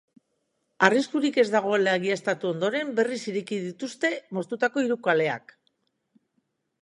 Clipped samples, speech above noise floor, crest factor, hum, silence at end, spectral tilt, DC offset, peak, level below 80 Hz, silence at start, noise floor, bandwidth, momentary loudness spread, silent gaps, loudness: under 0.1%; 51 dB; 26 dB; none; 1.45 s; -5 dB/octave; under 0.1%; -2 dBFS; -80 dBFS; 0.8 s; -76 dBFS; 11 kHz; 10 LU; none; -25 LUFS